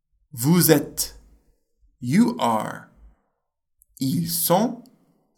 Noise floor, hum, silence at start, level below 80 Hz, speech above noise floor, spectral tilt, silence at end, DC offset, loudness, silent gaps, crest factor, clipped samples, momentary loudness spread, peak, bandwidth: -76 dBFS; none; 0.35 s; -56 dBFS; 55 dB; -5 dB/octave; 0.55 s; under 0.1%; -21 LUFS; none; 22 dB; under 0.1%; 17 LU; -2 dBFS; 19 kHz